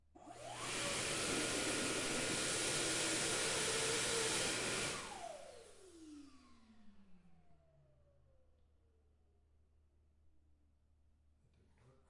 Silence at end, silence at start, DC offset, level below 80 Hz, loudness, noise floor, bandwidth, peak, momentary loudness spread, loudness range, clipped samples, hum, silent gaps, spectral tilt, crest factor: 0.2 s; 0.15 s; under 0.1%; -66 dBFS; -37 LUFS; -73 dBFS; 11.5 kHz; -26 dBFS; 18 LU; 12 LU; under 0.1%; none; none; -1.5 dB/octave; 18 dB